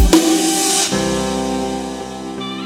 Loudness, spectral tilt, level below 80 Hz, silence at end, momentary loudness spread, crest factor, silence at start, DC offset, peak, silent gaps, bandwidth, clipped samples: -16 LUFS; -3.5 dB/octave; -26 dBFS; 0 s; 14 LU; 16 dB; 0 s; under 0.1%; 0 dBFS; none; 17 kHz; under 0.1%